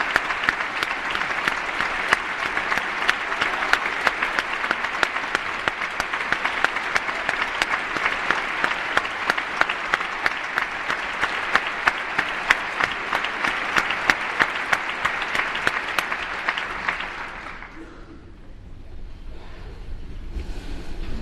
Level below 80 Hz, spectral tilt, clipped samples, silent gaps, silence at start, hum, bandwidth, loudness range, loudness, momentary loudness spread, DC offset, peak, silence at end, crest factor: -42 dBFS; -2.5 dB/octave; under 0.1%; none; 0 s; none; 13 kHz; 9 LU; -23 LUFS; 15 LU; under 0.1%; 0 dBFS; 0 s; 24 dB